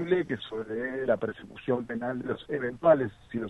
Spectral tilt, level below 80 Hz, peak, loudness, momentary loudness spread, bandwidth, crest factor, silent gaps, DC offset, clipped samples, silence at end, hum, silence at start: -8 dB/octave; -60 dBFS; -8 dBFS; -30 LUFS; 11 LU; 8 kHz; 20 dB; none; under 0.1%; under 0.1%; 0 s; none; 0 s